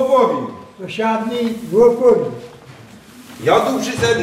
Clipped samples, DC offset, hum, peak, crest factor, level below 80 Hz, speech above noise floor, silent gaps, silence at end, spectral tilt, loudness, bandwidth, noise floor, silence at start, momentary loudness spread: under 0.1%; under 0.1%; none; -2 dBFS; 16 dB; -50 dBFS; 24 dB; none; 0 s; -5 dB/octave; -16 LUFS; 15.5 kHz; -40 dBFS; 0 s; 16 LU